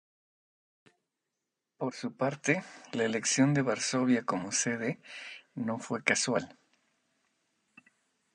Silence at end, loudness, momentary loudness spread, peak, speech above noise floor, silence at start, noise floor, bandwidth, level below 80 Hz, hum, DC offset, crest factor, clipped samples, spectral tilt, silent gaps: 1.85 s; -31 LUFS; 13 LU; -10 dBFS; 56 dB; 1.8 s; -86 dBFS; 11 kHz; -76 dBFS; none; under 0.1%; 24 dB; under 0.1%; -4 dB/octave; none